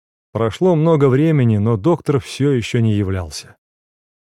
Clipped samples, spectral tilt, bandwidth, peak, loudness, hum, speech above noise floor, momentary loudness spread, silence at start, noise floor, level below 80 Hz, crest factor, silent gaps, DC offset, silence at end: under 0.1%; -7.5 dB/octave; 12.5 kHz; -2 dBFS; -16 LUFS; none; over 74 dB; 11 LU; 0.35 s; under -90 dBFS; -48 dBFS; 14 dB; none; under 0.1%; 0.95 s